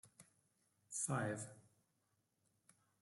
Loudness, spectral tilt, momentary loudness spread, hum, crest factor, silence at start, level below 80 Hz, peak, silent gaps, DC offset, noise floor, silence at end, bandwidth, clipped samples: -44 LUFS; -4.5 dB/octave; 15 LU; none; 22 dB; 0.05 s; -86 dBFS; -26 dBFS; none; under 0.1%; -84 dBFS; 1.4 s; 12.5 kHz; under 0.1%